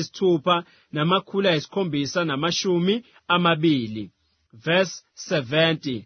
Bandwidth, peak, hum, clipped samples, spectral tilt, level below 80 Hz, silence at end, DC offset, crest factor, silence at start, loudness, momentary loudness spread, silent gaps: 6.6 kHz; -6 dBFS; none; under 0.1%; -5 dB/octave; -64 dBFS; 0 s; under 0.1%; 18 dB; 0 s; -23 LUFS; 11 LU; none